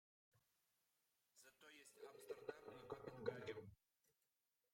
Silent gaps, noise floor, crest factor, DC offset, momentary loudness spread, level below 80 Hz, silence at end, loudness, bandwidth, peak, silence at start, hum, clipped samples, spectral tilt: none; under -90 dBFS; 26 dB; under 0.1%; 15 LU; -86 dBFS; 1 s; -55 LUFS; 16 kHz; -32 dBFS; 0.35 s; none; under 0.1%; -5 dB/octave